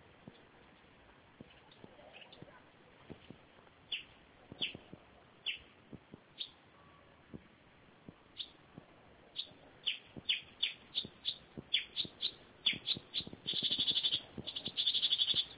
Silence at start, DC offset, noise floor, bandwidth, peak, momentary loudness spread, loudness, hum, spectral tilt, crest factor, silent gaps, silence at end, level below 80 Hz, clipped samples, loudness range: 0.25 s; under 0.1%; -63 dBFS; 4 kHz; -18 dBFS; 26 LU; -36 LUFS; none; 0.5 dB/octave; 24 dB; none; 0 s; -72 dBFS; under 0.1%; 17 LU